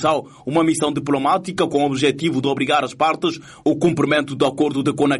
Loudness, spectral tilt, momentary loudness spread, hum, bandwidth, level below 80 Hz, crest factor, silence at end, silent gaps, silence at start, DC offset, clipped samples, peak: -19 LUFS; -5 dB/octave; 5 LU; none; 11.5 kHz; -56 dBFS; 14 dB; 0 s; none; 0 s; under 0.1%; under 0.1%; -6 dBFS